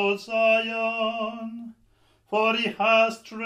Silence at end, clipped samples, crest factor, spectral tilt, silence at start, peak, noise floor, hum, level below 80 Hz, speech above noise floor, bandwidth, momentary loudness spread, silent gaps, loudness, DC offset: 0 s; under 0.1%; 18 dB; -4 dB/octave; 0 s; -8 dBFS; -62 dBFS; none; -70 dBFS; 38 dB; 11 kHz; 14 LU; none; -23 LUFS; under 0.1%